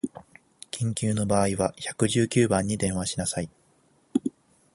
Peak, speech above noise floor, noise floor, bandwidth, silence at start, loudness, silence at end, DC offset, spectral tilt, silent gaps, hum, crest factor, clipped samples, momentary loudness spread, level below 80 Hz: -8 dBFS; 38 dB; -63 dBFS; 11.5 kHz; 0.05 s; -26 LUFS; 0.45 s; under 0.1%; -5 dB/octave; none; none; 20 dB; under 0.1%; 12 LU; -52 dBFS